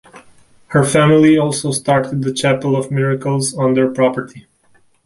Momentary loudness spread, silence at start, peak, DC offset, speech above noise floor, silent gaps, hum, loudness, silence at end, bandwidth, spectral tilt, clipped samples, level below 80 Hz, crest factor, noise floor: 8 LU; 0.15 s; -2 dBFS; under 0.1%; 39 dB; none; none; -15 LUFS; 0.65 s; 11.5 kHz; -5.5 dB/octave; under 0.1%; -52 dBFS; 14 dB; -53 dBFS